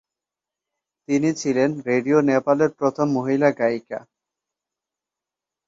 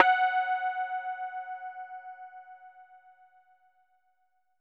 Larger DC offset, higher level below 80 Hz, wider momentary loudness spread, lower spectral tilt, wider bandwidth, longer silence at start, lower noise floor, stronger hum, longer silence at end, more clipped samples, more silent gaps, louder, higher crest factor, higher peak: neither; first, -66 dBFS vs under -90 dBFS; second, 6 LU vs 24 LU; first, -6.5 dB/octave vs -1.5 dB/octave; first, 7.8 kHz vs 4.7 kHz; first, 1.1 s vs 0 s; first, -88 dBFS vs -75 dBFS; neither; about the same, 1.7 s vs 1.65 s; neither; neither; first, -21 LUFS vs -31 LUFS; second, 18 dB vs 30 dB; about the same, -4 dBFS vs -2 dBFS